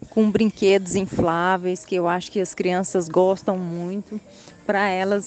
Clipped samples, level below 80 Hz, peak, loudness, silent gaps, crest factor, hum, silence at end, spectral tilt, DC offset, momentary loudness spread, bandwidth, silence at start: under 0.1%; -54 dBFS; -6 dBFS; -22 LUFS; none; 16 dB; none; 0 s; -5.5 dB/octave; under 0.1%; 10 LU; 9 kHz; 0 s